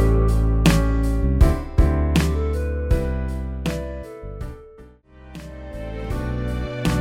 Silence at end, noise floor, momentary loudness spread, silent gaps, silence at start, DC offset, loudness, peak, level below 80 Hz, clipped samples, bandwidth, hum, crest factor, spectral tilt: 0 s; -46 dBFS; 18 LU; none; 0 s; under 0.1%; -22 LUFS; -2 dBFS; -22 dBFS; under 0.1%; 15.5 kHz; none; 18 dB; -6.5 dB/octave